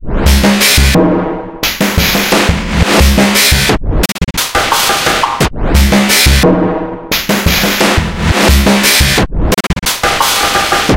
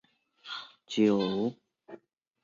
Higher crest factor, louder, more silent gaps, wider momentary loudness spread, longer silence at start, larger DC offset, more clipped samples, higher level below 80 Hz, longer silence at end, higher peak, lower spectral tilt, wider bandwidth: second, 10 dB vs 20 dB; first, -9 LUFS vs -30 LUFS; neither; second, 7 LU vs 16 LU; second, 0 s vs 0.45 s; neither; first, 0.1% vs under 0.1%; first, -16 dBFS vs -72 dBFS; second, 0 s vs 0.5 s; first, 0 dBFS vs -14 dBFS; second, -3.5 dB/octave vs -6 dB/octave; first, 17.5 kHz vs 7.6 kHz